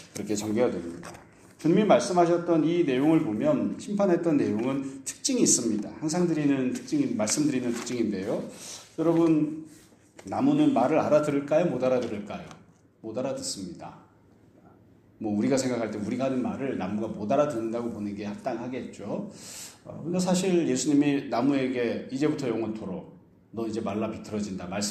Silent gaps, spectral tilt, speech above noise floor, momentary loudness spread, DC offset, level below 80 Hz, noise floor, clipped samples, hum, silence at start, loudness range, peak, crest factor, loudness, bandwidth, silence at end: none; -5 dB/octave; 31 dB; 15 LU; under 0.1%; -66 dBFS; -58 dBFS; under 0.1%; none; 0 s; 7 LU; -8 dBFS; 20 dB; -27 LUFS; 14 kHz; 0 s